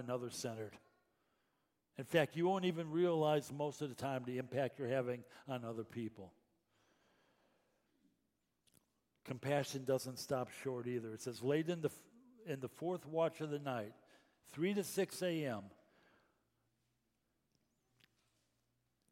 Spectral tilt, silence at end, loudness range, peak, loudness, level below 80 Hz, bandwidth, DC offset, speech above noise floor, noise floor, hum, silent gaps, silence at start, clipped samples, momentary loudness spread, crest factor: -5.5 dB/octave; 3.4 s; 11 LU; -20 dBFS; -41 LUFS; -84 dBFS; 16.5 kHz; under 0.1%; 45 dB; -85 dBFS; none; none; 0 s; under 0.1%; 14 LU; 24 dB